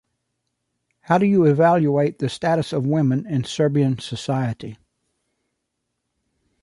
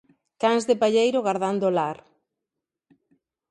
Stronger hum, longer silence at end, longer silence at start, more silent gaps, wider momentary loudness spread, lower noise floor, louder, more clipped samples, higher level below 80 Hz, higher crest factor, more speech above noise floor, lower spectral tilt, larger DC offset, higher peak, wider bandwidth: neither; first, 1.9 s vs 1.55 s; first, 1.1 s vs 0.4 s; neither; first, 10 LU vs 7 LU; second, -77 dBFS vs -86 dBFS; first, -20 LUFS vs -23 LUFS; neither; first, -60 dBFS vs -74 dBFS; about the same, 18 dB vs 18 dB; second, 58 dB vs 64 dB; first, -7 dB/octave vs -5 dB/octave; neither; first, -2 dBFS vs -8 dBFS; about the same, 11.5 kHz vs 11.5 kHz